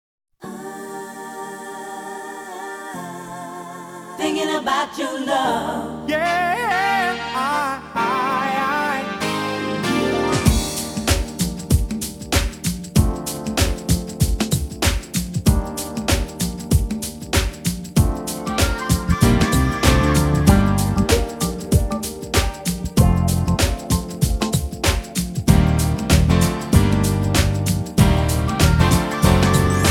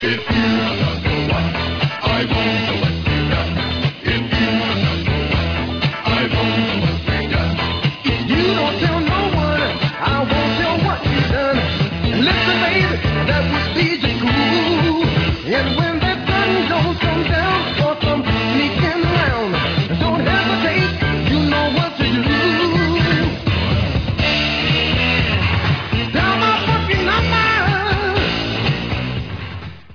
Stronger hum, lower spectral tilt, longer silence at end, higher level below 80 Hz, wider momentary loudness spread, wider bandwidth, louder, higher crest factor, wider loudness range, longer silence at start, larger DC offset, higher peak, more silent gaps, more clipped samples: neither; second, -5 dB/octave vs -6.5 dB/octave; about the same, 0 s vs 0 s; about the same, -26 dBFS vs -30 dBFS; first, 15 LU vs 4 LU; first, 19 kHz vs 5.4 kHz; about the same, -19 LUFS vs -17 LUFS; first, 20 dB vs 14 dB; first, 6 LU vs 2 LU; first, 0.4 s vs 0 s; neither; about the same, 0 dBFS vs -2 dBFS; neither; neither